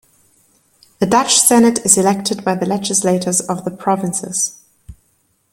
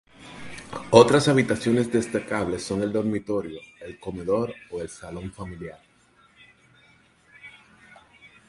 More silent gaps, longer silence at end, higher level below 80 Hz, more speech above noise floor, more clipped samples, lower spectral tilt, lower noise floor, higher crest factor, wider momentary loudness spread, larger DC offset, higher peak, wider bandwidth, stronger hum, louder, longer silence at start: neither; first, 0.6 s vs 0.2 s; about the same, -52 dBFS vs -54 dBFS; first, 46 dB vs 36 dB; neither; second, -3.5 dB/octave vs -5.5 dB/octave; about the same, -61 dBFS vs -59 dBFS; second, 16 dB vs 26 dB; second, 10 LU vs 24 LU; neither; about the same, 0 dBFS vs 0 dBFS; first, 16.5 kHz vs 11.5 kHz; neither; first, -14 LUFS vs -23 LUFS; first, 1 s vs 0.2 s